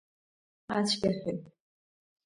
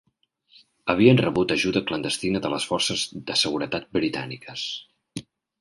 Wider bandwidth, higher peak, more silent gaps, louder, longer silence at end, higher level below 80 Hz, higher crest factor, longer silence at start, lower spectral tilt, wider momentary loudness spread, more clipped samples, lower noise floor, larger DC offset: about the same, 11.5 kHz vs 11.5 kHz; second, -16 dBFS vs -4 dBFS; neither; second, -31 LUFS vs -23 LUFS; first, 0.75 s vs 0.4 s; second, -66 dBFS vs -56 dBFS; about the same, 20 dB vs 22 dB; second, 0.7 s vs 0.85 s; about the same, -4.5 dB/octave vs -4.5 dB/octave; second, 10 LU vs 17 LU; neither; first, under -90 dBFS vs -65 dBFS; neither